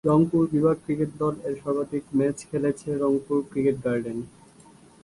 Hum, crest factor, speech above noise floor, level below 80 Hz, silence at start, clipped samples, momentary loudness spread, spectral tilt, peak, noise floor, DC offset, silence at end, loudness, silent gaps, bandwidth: none; 16 dB; 28 dB; -56 dBFS; 0.05 s; under 0.1%; 7 LU; -8.5 dB/octave; -8 dBFS; -52 dBFS; under 0.1%; 0.75 s; -25 LUFS; none; 11.5 kHz